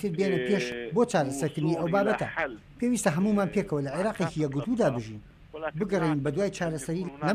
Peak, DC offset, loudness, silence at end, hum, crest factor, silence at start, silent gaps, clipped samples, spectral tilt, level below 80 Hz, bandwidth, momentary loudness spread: -12 dBFS; under 0.1%; -28 LUFS; 0 s; none; 16 dB; 0 s; none; under 0.1%; -6 dB/octave; -56 dBFS; 15.5 kHz; 8 LU